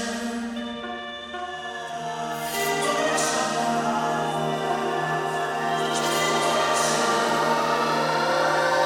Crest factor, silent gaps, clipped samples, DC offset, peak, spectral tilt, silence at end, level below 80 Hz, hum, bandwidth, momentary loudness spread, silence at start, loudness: 16 dB; none; under 0.1%; under 0.1%; -10 dBFS; -3 dB/octave; 0 s; -62 dBFS; none; 18.5 kHz; 11 LU; 0 s; -24 LUFS